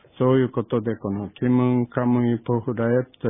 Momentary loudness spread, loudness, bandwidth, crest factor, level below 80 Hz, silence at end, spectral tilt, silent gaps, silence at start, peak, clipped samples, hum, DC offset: 6 LU; -22 LUFS; 3.8 kHz; 16 dB; -56 dBFS; 0 s; -12.5 dB/octave; none; 0.2 s; -6 dBFS; under 0.1%; none; under 0.1%